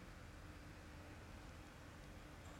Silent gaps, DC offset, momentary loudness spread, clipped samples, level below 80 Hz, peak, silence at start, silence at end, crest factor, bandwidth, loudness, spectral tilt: none; under 0.1%; 1 LU; under 0.1%; -62 dBFS; -44 dBFS; 0 s; 0 s; 12 dB; 16.5 kHz; -58 LUFS; -5 dB/octave